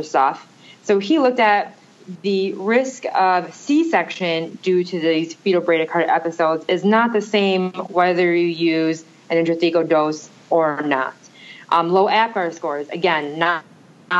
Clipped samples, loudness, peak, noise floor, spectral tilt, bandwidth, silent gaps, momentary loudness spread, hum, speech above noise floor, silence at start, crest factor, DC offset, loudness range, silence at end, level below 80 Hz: under 0.1%; -19 LUFS; -2 dBFS; -42 dBFS; -5.5 dB/octave; 8 kHz; none; 7 LU; none; 24 dB; 0 s; 16 dB; under 0.1%; 2 LU; 0 s; -78 dBFS